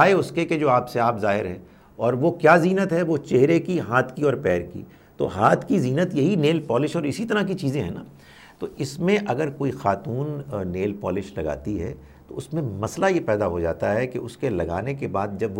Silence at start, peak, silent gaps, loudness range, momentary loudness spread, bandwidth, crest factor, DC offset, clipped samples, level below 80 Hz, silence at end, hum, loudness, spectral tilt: 0 s; -2 dBFS; none; 6 LU; 11 LU; 16.5 kHz; 20 dB; under 0.1%; under 0.1%; -50 dBFS; 0 s; none; -23 LUFS; -7 dB/octave